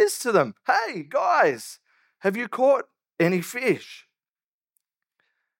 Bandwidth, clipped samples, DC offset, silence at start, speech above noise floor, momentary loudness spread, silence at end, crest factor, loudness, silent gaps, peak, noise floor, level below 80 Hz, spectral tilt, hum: 17 kHz; under 0.1%; under 0.1%; 0 s; over 67 dB; 11 LU; 1.65 s; 20 dB; -23 LUFS; none; -6 dBFS; under -90 dBFS; -84 dBFS; -4.5 dB/octave; none